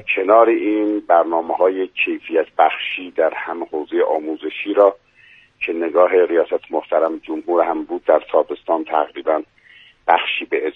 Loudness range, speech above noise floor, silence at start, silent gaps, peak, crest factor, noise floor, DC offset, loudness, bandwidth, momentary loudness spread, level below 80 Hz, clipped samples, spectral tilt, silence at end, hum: 2 LU; 32 dB; 0.05 s; none; 0 dBFS; 18 dB; -50 dBFS; under 0.1%; -18 LUFS; 4 kHz; 9 LU; -64 dBFS; under 0.1%; -6 dB/octave; 0.05 s; none